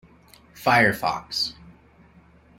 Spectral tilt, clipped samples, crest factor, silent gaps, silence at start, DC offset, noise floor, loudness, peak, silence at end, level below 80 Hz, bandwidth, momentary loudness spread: -4 dB/octave; under 0.1%; 22 dB; none; 0.55 s; under 0.1%; -53 dBFS; -22 LUFS; -4 dBFS; 1.05 s; -56 dBFS; 16.5 kHz; 9 LU